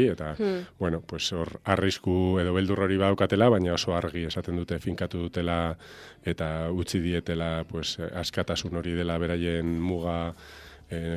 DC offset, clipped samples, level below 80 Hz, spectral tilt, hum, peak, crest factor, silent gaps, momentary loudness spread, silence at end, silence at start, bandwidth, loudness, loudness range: under 0.1%; under 0.1%; -46 dBFS; -6 dB/octave; none; -6 dBFS; 22 dB; none; 9 LU; 0 s; 0 s; 13.5 kHz; -28 LUFS; 5 LU